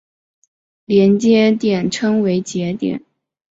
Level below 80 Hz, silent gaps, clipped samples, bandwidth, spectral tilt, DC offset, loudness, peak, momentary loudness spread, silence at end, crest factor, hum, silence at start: -58 dBFS; none; under 0.1%; 8 kHz; -6 dB/octave; under 0.1%; -16 LUFS; -2 dBFS; 10 LU; 0.6 s; 14 dB; none; 0.9 s